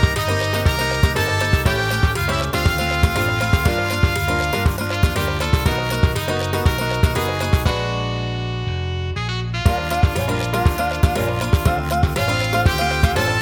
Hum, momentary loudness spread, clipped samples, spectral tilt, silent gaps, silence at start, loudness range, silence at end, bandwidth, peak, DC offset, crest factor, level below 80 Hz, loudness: none; 5 LU; under 0.1%; -5 dB/octave; none; 0 s; 3 LU; 0 s; over 20 kHz; -2 dBFS; under 0.1%; 16 dB; -26 dBFS; -19 LUFS